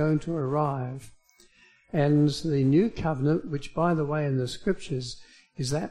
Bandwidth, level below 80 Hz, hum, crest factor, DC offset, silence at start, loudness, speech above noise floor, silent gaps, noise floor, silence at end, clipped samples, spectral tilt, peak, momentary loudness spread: 11.5 kHz; -50 dBFS; none; 16 dB; under 0.1%; 0 s; -27 LUFS; 33 dB; none; -59 dBFS; 0 s; under 0.1%; -7 dB/octave; -12 dBFS; 12 LU